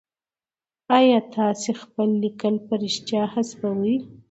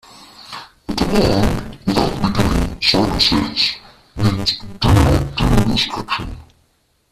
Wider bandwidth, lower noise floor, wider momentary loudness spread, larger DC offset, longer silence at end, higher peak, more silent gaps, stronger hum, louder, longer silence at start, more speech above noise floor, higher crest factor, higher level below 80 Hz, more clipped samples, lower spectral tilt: second, 8.2 kHz vs 14.5 kHz; first, under -90 dBFS vs -61 dBFS; second, 9 LU vs 18 LU; neither; second, 0.25 s vs 0.7 s; second, -4 dBFS vs 0 dBFS; neither; neither; second, -23 LUFS vs -17 LUFS; first, 0.9 s vs 0.2 s; first, over 68 dB vs 45 dB; about the same, 20 dB vs 16 dB; second, -70 dBFS vs -26 dBFS; neither; about the same, -5 dB/octave vs -5.5 dB/octave